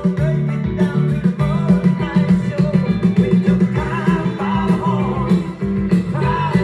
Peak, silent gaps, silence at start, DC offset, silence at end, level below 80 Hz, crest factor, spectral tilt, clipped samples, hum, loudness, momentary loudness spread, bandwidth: -2 dBFS; none; 0 s; under 0.1%; 0 s; -36 dBFS; 14 dB; -9 dB/octave; under 0.1%; none; -17 LUFS; 4 LU; 9.6 kHz